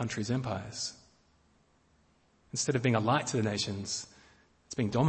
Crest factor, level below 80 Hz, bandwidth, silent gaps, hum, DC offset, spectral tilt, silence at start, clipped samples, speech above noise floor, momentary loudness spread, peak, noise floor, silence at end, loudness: 20 dB; -64 dBFS; 8.8 kHz; none; none; under 0.1%; -4.5 dB/octave; 0 s; under 0.1%; 37 dB; 10 LU; -14 dBFS; -68 dBFS; 0 s; -32 LUFS